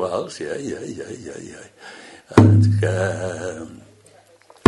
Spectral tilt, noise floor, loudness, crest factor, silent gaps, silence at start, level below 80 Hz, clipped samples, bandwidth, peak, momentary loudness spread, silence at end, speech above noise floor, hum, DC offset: -7 dB/octave; -51 dBFS; -19 LUFS; 20 dB; none; 0 s; -50 dBFS; under 0.1%; 11 kHz; 0 dBFS; 26 LU; 0.9 s; 32 dB; none; under 0.1%